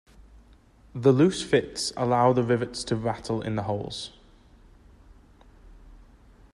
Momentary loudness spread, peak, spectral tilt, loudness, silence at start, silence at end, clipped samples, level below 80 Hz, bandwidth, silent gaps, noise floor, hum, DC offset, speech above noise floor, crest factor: 13 LU; -8 dBFS; -5.5 dB/octave; -25 LUFS; 0.35 s; 0.6 s; under 0.1%; -52 dBFS; 12 kHz; none; -55 dBFS; none; under 0.1%; 31 dB; 20 dB